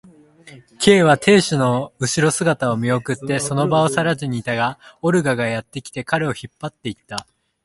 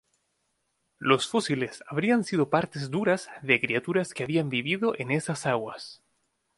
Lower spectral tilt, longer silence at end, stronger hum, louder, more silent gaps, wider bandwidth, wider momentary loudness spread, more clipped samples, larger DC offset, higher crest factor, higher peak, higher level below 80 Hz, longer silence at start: about the same, -5 dB/octave vs -5 dB/octave; second, 0.4 s vs 0.65 s; neither; first, -18 LUFS vs -27 LUFS; neither; about the same, 11.5 kHz vs 11.5 kHz; first, 16 LU vs 7 LU; neither; neither; about the same, 18 dB vs 22 dB; first, 0 dBFS vs -6 dBFS; first, -54 dBFS vs -68 dBFS; second, 0.45 s vs 1 s